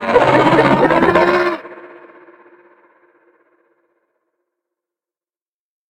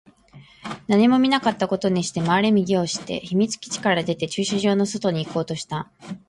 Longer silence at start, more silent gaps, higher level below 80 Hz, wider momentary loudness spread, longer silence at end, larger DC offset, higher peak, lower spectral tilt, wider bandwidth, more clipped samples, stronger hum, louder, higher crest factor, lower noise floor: second, 0 s vs 0.35 s; neither; first, -48 dBFS vs -58 dBFS; about the same, 12 LU vs 12 LU; first, 4.05 s vs 0.1 s; neither; first, 0 dBFS vs -6 dBFS; first, -6.5 dB/octave vs -5 dB/octave; about the same, 11 kHz vs 11.5 kHz; neither; neither; first, -12 LUFS vs -22 LUFS; about the same, 18 dB vs 16 dB; first, under -90 dBFS vs -49 dBFS